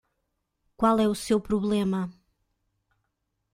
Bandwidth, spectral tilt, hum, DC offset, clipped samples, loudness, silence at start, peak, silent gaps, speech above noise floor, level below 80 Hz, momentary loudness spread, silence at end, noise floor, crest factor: 16 kHz; -6 dB/octave; none; under 0.1%; under 0.1%; -25 LUFS; 0.8 s; -10 dBFS; none; 55 dB; -54 dBFS; 8 LU; 1.45 s; -79 dBFS; 18 dB